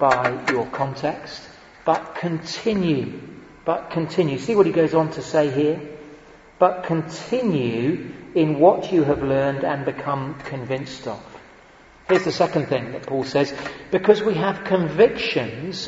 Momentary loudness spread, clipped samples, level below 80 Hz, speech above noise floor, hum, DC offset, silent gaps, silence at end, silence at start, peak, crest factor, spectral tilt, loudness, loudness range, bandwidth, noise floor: 13 LU; under 0.1%; -54 dBFS; 28 dB; none; under 0.1%; none; 0 s; 0 s; -2 dBFS; 20 dB; -6.5 dB/octave; -22 LUFS; 4 LU; 8 kHz; -49 dBFS